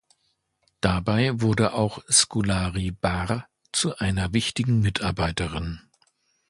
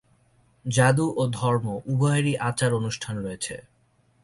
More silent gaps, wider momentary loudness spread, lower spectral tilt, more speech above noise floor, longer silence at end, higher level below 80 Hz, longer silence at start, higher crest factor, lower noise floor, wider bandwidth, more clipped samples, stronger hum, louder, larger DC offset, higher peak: neither; about the same, 10 LU vs 12 LU; second, -4 dB/octave vs -5.5 dB/octave; first, 48 dB vs 40 dB; about the same, 0.7 s vs 0.65 s; first, -40 dBFS vs -58 dBFS; first, 0.85 s vs 0.65 s; about the same, 22 dB vs 18 dB; first, -72 dBFS vs -64 dBFS; about the same, 11.5 kHz vs 11.5 kHz; neither; neither; about the same, -24 LUFS vs -25 LUFS; neither; first, -2 dBFS vs -8 dBFS